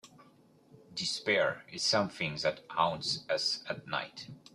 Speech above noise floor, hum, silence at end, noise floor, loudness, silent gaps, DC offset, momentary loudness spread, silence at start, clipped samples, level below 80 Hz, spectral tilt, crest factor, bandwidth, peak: 29 dB; none; 0.15 s; -62 dBFS; -32 LUFS; none; under 0.1%; 8 LU; 0.05 s; under 0.1%; -72 dBFS; -3 dB/octave; 22 dB; 13 kHz; -12 dBFS